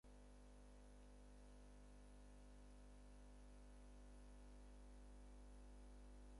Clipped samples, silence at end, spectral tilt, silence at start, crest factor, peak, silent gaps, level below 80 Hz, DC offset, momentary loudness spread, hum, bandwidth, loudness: under 0.1%; 0 s; -5.5 dB/octave; 0.05 s; 10 dB; -52 dBFS; none; -64 dBFS; under 0.1%; 2 LU; 50 Hz at -65 dBFS; 11 kHz; -66 LUFS